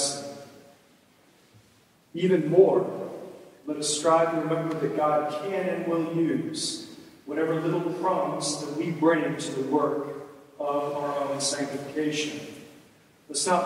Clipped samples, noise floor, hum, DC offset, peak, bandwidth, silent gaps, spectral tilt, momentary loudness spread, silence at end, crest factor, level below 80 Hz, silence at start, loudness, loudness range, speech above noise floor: under 0.1%; -60 dBFS; none; under 0.1%; -6 dBFS; 15.5 kHz; none; -4.5 dB/octave; 18 LU; 0 s; 22 dB; -76 dBFS; 0 s; -26 LUFS; 4 LU; 35 dB